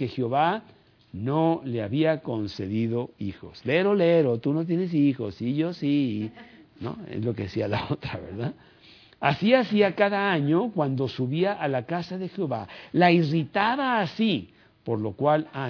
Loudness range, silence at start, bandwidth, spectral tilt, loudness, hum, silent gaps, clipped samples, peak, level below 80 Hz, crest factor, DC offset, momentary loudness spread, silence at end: 5 LU; 0 s; 5.4 kHz; -8.5 dB/octave; -25 LUFS; none; none; under 0.1%; -6 dBFS; -62 dBFS; 20 dB; under 0.1%; 13 LU; 0 s